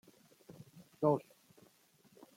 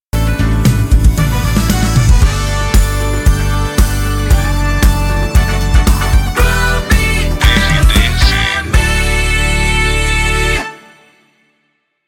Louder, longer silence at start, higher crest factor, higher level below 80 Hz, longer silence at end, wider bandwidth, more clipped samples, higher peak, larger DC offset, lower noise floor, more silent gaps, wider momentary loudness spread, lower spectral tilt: second, -35 LUFS vs -12 LUFS; first, 0.5 s vs 0.15 s; first, 22 dB vs 12 dB; second, -84 dBFS vs -14 dBFS; about the same, 1.2 s vs 1.3 s; about the same, 16.5 kHz vs 17.5 kHz; neither; second, -18 dBFS vs 0 dBFS; neither; first, -68 dBFS vs -63 dBFS; neither; first, 25 LU vs 4 LU; first, -8.5 dB/octave vs -4.5 dB/octave